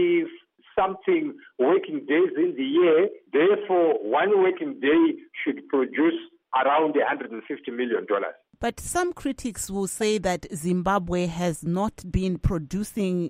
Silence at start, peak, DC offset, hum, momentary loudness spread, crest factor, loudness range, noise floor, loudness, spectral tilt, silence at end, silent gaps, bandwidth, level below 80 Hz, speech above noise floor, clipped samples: 0 s; -10 dBFS; under 0.1%; none; 10 LU; 14 dB; 5 LU; -47 dBFS; -24 LUFS; -5.5 dB/octave; 0 s; none; 15.5 kHz; -44 dBFS; 24 dB; under 0.1%